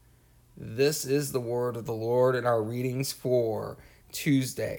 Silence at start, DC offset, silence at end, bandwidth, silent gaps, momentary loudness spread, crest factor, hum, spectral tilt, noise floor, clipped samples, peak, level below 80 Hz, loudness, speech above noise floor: 0.6 s; under 0.1%; 0 s; 19.5 kHz; none; 11 LU; 16 dB; none; -5.5 dB/octave; -59 dBFS; under 0.1%; -12 dBFS; -60 dBFS; -28 LUFS; 32 dB